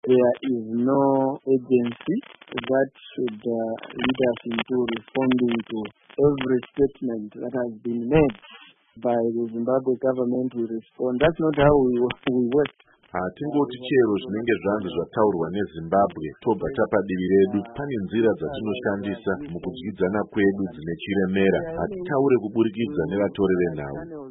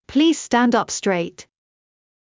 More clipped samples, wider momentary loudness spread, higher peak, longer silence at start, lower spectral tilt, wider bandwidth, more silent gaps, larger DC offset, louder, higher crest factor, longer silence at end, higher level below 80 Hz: neither; first, 10 LU vs 7 LU; about the same, -4 dBFS vs -6 dBFS; about the same, 0.05 s vs 0.1 s; first, -11.5 dB/octave vs -4 dB/octave; second, 4 kHz vs 7.8 kHz; neither; neither; second, -24 LUFS vs -19 LUFS; about the same, 18 dB vs 16 dB; second, 0 s vs 0.85 s; first, -50 dBFS vs -56 dBFS